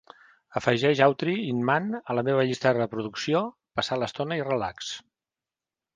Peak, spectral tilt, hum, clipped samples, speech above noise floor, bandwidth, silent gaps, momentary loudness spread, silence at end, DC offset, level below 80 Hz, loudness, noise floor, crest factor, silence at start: -6 dBFS; -5.5 dB/octave; none; under 0.1%; over 64 dB; 9.8 kHz; none; 10 LU; 0.95 s; under 0.1%; -64 dBFS; -26 LUFS; under -90 dBFS; 22 dB; 0.5 s